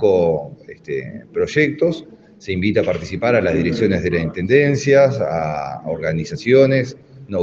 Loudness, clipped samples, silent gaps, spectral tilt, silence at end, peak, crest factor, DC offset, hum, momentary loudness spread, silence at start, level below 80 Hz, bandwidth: -18 LUFS; under 0.1%; none; -6.5 dB/octave; 0 s; 0 dBFS; 18 dB; under 0.1%; none; 13 LU; 0 s; -46 dBFS; 7.6 kHz